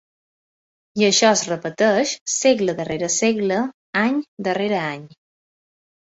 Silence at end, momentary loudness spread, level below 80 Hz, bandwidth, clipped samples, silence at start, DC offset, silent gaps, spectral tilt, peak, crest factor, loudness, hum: 0.95 s; 9 LU; -62 dBFS; 8.2 kHz; under 0.1%; 0.95 s; under 0.1%; 2.21-2.26 s, 3.74-3.93 s, 4.28-4.37 s; -3 dB/octave; -2 dBFS; 18 dB; -20 LUFS; none